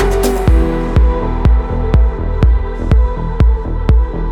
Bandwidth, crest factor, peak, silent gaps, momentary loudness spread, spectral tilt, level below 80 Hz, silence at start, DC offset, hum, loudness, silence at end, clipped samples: 14 kHz; 12 dB; 0 dBFS; none; 3 LU; -7.5 dB/octave; -12 dBFS; 0 s; under 0.1%; none; -14 LUFS; 0 s; under 0.1%